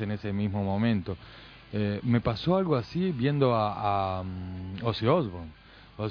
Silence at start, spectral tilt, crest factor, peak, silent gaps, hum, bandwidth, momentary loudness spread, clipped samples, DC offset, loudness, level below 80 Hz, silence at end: 0 s; -9 dB/octave; 18 dB; -10 dBFS; none; none; 5.4 kHz; 13 LU; under 0.1%; under 0.1%; -28 LUFS; -52 dBFS; 0 s